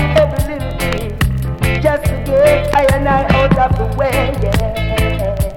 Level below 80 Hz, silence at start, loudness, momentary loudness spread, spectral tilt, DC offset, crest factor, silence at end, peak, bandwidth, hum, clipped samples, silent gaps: -22 dBFS; 0 s; -15 LUFS; 7 LU; -6 dB/octave; under 0.1%; 14 dB; 0 s; 0 dBFS; 17 kHz; none; under 0.1%; none